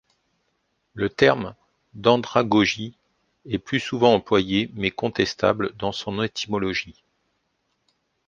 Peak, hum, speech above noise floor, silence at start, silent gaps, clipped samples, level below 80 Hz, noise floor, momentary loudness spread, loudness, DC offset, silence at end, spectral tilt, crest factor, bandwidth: -2 dBFS; none; 51 dB; 0.95 s; none; under 0.1%; -54 dBFS; -73 dBFS; 12 LU; -22 LUFS; under 0.1%; 1.35 s; -5.5 dB/octave; 22 dB; 8.8 kHz